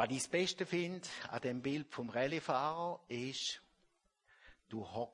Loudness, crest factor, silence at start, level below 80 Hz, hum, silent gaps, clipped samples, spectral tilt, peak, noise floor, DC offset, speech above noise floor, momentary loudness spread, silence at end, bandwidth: -39 LUFS; 20 dB; 0 s; -76 dBFS; none; none; under 0.1%; -4 dB/octave; -20 dBFS; -77 dBFS; under 0.1%; 38 dB; 9 LU; 0.05 s; 11.5 kHz